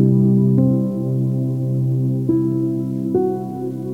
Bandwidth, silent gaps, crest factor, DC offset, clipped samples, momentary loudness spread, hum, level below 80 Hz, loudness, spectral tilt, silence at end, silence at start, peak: 1.6 kHz; none; 14 dB; 0.3%; under 0.1%; 8 LU; none; -56 dBFS; -19 LUFS; -12 dB/octave; 0 s; 0 s; -4 dBFS